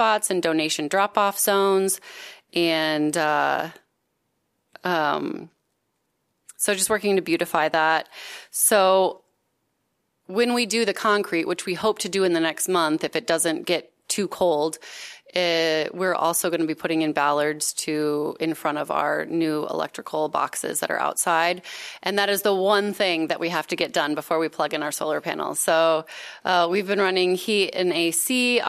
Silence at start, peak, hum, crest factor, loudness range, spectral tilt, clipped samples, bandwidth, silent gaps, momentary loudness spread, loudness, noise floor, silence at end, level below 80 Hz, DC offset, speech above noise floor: 0 s; -4 dBFS; none; 20 dB; 3 LU; -2.5 dB/octave; under 0.1%; 15.5 kHz; none; 8 LU; -23 LUFS; -74 dBFS; 0 s; -72 dBFS; under 0.1%; 51 dB